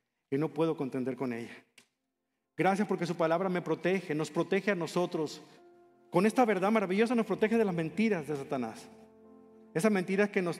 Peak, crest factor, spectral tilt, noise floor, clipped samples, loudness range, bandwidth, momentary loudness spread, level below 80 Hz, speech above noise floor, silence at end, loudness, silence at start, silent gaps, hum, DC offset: -12 dBFS; 20 dB; -6.5 dB/octave; -84 dBFS; under 0.1%; 3 LU; 14 kHz; 9 LU; -82 dBFS; 54 dB; 0 s; -31 LUFS; 0.3 s; none; none; under 0.1%